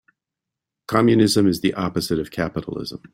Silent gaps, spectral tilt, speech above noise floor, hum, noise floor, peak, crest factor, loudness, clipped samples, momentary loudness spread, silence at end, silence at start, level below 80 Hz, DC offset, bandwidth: none; -5.5 dB/octave; 65 dB; none; -85 dBFS; -2 dBFS; 20 dB; -20 LUFS; under 0.1%; 12 LU; 0.15 s; 0.9 s; -52 dBFS; under 0.1%; 16.5 kHz